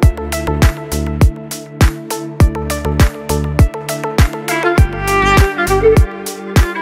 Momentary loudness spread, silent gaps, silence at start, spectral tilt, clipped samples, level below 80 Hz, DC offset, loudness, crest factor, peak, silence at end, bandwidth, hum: 9 LU; none; 0 s; -5.5 dB/octave; under 0.1%; -18 dBFS; under 0.1%; -14 LUFS; 12 dB; 0 dBFS; 0 s; 16.5 kHz; none